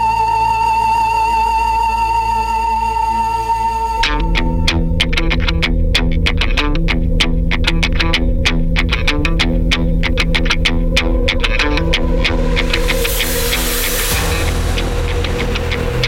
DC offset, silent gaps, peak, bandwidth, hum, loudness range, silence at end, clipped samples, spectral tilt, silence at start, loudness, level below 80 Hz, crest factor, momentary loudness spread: under 0.1%; none; -4 dBFS; 17 kHz; none; 1 LU; 0 s; under 0.1%; -4 dB/octave; 0 s; -15 LUFS; -18 dBFS; 10 dB; 3 LU